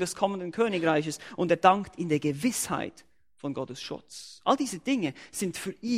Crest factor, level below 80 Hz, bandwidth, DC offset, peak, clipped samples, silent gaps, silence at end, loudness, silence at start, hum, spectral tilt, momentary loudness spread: 24 dB; -66 dBFS; 16 kHz; under 0.1%; -6 dBFS; under 0.1%; none; 0 s; -28 LUFS; 0 s; none; -4.5 dB/octave; 15 LU